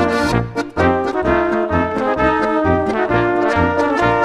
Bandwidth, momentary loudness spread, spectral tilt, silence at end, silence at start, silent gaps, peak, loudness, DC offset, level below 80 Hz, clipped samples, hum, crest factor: 13.5 kHz; 2 LU; -6.5 dB/octave; 0 s; 0 s; none; -2 dBFS; -16 LUFS; under 0.1%; -34 dBFS; under 0.1%; none; 14 dB